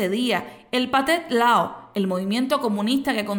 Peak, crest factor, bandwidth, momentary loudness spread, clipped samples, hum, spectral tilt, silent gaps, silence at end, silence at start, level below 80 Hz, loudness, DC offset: -8 dBFS; 14 dB; 19 kHz; 8 LU; under 0.1%; none; -4.5 dB/octave; none; 0 s; 0 s; -60 dBFS; -22 LUFS; under 0.1%